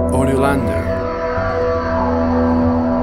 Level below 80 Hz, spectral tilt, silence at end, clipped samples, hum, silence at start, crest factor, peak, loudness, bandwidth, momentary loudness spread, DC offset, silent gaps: -28 dBFS; -7.5 dB/octave; 0 s; under 0.1%; none; 0 s; 14 dB; -2 dBFS; -17 LUFS; 13 kHz; 5 LU; under 0.1%; none